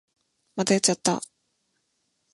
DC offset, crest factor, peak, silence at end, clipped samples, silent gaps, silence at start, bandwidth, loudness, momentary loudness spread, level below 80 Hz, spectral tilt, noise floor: under 0.1%; 24 dB; -4 dBFS; 1.15 s; under 0.1%; none; 0.55 s; 11.5 kHz; -24 LUFS; 17 LU; -72 dBFS; -3.5 dB/octave; -74 dBFS